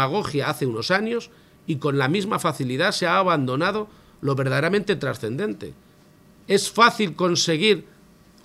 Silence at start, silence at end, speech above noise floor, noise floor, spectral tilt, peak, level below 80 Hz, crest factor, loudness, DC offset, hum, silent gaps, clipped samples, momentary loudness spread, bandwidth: 0 s; 0.6 s; 31 dB; -53 dBFS; -4.5 dB/octave; -2 dBFS; -60 dBFS; 20 dB; -22 LUFS; under 0.1%; none; none; under 0.1%; 12 LU; 15.5 kHz